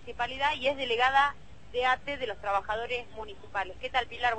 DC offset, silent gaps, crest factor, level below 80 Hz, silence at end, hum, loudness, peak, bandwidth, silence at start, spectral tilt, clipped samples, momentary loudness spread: 0.5%; none; 18 dB; -54 dBFS; 0 s; none; -29 LUFS; -12 dBFS; 8.8 kHz; 0 s; -3 dB/octave; under 0.1%; 12 LU